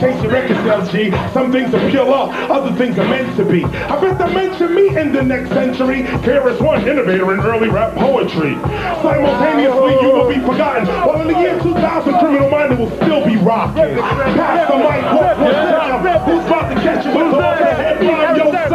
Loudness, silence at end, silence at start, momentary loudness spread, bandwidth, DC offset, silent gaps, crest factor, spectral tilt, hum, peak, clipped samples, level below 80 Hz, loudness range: -14 LUFS; 0 s; 0 s; 4 LU; 13.5 kHz; under 0.1%; none; 12 dB; -7.5 dB/octave; none; -2 dBFS; under 0.1%; -36 dBFS; 2 LU